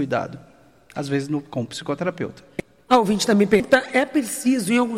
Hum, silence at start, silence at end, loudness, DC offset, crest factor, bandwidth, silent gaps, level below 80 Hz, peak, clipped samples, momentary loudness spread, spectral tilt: none; 0 s; 0 s; -21 LUFS; under 0.1%; 18 dB; 16.5 kHz; none; -56 dBFS; -4 dBFS; under 0.1%; 17 LU; -5 dB/octave